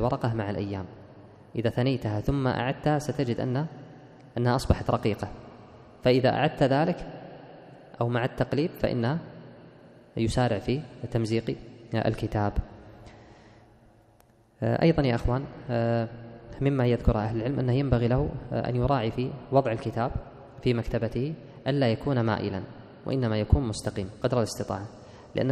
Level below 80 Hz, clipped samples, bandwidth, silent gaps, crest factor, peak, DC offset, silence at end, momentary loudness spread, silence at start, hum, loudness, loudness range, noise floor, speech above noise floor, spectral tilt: -42 dBFS; under 0.1%; 13 kHz; none; 20 dB; -6 dBFS; under 0.1%; 0 s; 15 LU; 0 s; none; -28 LUFS; 4 LU; -60 dBFS; 33 dB; -7 dB/octave